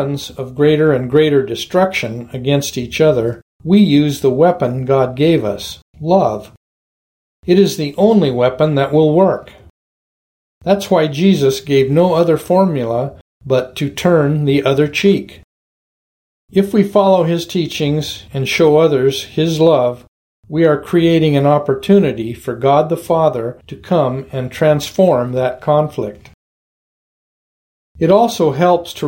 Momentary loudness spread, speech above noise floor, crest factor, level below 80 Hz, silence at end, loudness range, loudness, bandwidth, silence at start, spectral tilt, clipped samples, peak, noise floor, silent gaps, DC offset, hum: 11 LU; over 77 dB; 14 dB; -48 dBFS; 0 s; 3 LU; -14 LUFS; 17 kHz; 0 s; -6.5 dB/octave; under 0.1%; 0 dBFS; under -90 dBFS; 3.42-3.60 s, 5.82-5.94 s, 6.57-7.43 s, 9.70-10.61 s, 13.21-13.41 s, 15.44-16.48 s, 20.08-20.43 s, 26.34-27.95 s; under 0.1%; none